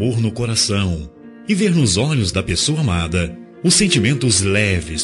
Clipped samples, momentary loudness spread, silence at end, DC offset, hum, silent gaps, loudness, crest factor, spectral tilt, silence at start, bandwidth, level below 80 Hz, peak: under 0.1%; 8 LU; 0 s; under 0.1%; none; none; -17 LUFS; 14 dB; -4 dB/octave; 0 s; 12 kHz; -40 dBFS; -2 dBFS